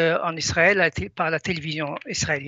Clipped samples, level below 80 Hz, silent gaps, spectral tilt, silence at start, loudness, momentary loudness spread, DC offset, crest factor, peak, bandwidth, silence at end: under 0.1%; -48 dBFS; none; -3.5 dB/octave; 0 s; -22 LUFS; 10 LU; under 0.1%; 18 dB; -4 dBFS; 8.2 kHz; 0 s